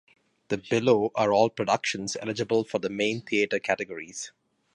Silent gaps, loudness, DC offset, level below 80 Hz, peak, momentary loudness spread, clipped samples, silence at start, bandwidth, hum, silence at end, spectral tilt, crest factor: none; -26 LUFS; under 0.1%; -68 dBFS; -8 dBFS; 12 LU; under 0.1%; 0.5 s; 11 kHz; none; 0.45 s; -4.5 dB/octave; 20 dB